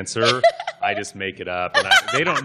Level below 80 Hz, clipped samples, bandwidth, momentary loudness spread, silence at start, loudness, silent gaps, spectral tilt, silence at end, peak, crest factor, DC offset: -58 dBFS; under 0.1%; 14.5 kHz; 11 LU; 0 s; -19 LUFS; none; -2.5 dB/octave; 0 s; -2 dBFS; 18 dB; under 0.1%